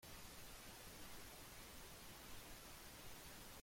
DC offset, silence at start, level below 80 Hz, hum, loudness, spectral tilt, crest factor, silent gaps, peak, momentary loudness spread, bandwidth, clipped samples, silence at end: under 0.1%; 0 s; -66 dBFS; none; -57 LUFS; -2.5 dB/octave; 14 dB; none; -42 dBFS; 1 LU; 16.5 kHz; under 0.1%; 0 s